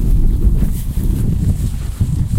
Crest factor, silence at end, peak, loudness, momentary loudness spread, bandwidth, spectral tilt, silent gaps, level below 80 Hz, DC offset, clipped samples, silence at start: 12 dB; 0 s; -2 dBFS; -18 LUFS; 4 LU; 16 kHz; -8 dB/octave; none; -16 dBFS; under 0.1%; under 0.1%; 0 s